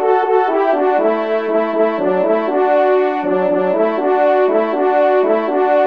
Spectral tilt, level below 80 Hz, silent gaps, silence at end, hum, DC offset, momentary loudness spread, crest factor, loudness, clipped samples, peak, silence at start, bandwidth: -8 dB/octave; -68 dBFS; none; 0 s; none; 0.4%; 3 LU; 12 dB; -15 LUFS; under 0.1%; -2 dBFS; 0 s; 5.2 kHz